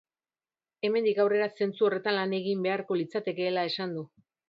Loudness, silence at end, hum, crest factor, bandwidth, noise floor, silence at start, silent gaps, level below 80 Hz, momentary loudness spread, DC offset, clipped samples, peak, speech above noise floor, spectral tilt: -29 LUFS; 0.4 s; none; 18 dB; 5.6 kHz; under -90 dBFS; 0.85 s; none; -80 dBFS; 8 LU; under 0.1%; under 0.1%; -12 dBFS; over 62 dB; -7 dB/octave